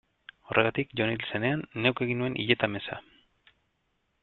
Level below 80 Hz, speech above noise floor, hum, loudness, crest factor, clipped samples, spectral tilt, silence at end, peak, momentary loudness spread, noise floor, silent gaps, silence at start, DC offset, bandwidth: -64 dBFS; 47 dB; none; -28 LUFS; 26 dB; under 0.1%; -9 dB/octave; 1.25 s; -6 dBFS; 7 LU; -75 dBFS; none; 0.5 s; under 0.1%; 4.4 kHz